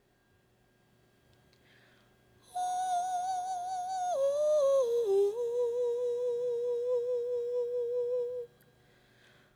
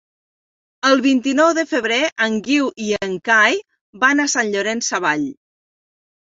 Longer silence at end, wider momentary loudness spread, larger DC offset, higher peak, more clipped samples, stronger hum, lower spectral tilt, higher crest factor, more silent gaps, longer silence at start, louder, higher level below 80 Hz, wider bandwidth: about the same, 1.1 s vs 1 s; about the same, 8 LU vs 8 LU; neither; second, -20 dBFS vs -2 dBFS; neither; neither; about the same, -3.5 dB/octave vs -2.5 dB/octave; second, 12 dB vs 18 dB; second, none vs 2.12-2.16 s, 3.81-3.93 s; first, 2.55 s vs 0.85 s; second, -32 LUFS vs -17 LUFS; second, -76 dBFS vs -64 dBFS; first, 14 kHz vs 7.8 kHz